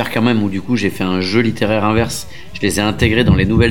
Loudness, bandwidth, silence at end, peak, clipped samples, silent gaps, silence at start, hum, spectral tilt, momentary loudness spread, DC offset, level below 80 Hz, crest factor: -15 LUFS; 17.5 kHz; 0 s; 0 dBFS; under 0.1%; none; 0 s; none; -5.5 dB/octave; 7 LU; 3%; -30 dBFS; 14 dB